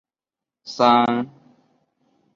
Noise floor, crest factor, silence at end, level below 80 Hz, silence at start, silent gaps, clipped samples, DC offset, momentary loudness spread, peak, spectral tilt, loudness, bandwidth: -89 dBFS; 20 dB; 1.1 s; -70 dBFS; 0.65 s; none; under 0.1%; under 0.1%; 21 LU; -2 dBFS; -5.5 dB/octave; -18 LUFS; 7.4 kHz